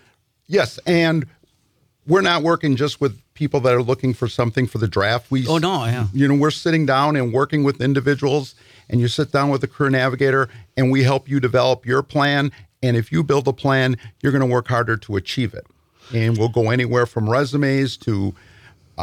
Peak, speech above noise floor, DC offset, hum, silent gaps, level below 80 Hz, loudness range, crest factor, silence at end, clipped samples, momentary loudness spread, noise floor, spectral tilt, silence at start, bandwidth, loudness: -6 dBFS; 44 dB; under 0.1%; none; none; -54 dBFS; 2 LU; 14 dB; 0 s; under 0.1%; 7 LU; -63 dBFS; -6.5 dB/octave; 0.5 s; 14.5 kHz; -19 LUFS